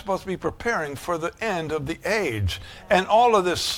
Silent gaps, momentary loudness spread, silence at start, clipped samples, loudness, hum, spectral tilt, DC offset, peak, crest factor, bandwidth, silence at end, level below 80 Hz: none; 11 LU; 0 s; under 0.1%; -23 LUFS; none; -4.5 dB/octave; under 0.1%; -6 dBFS; 18 dB; 17.5 kHz; 0 s; -46 dBFS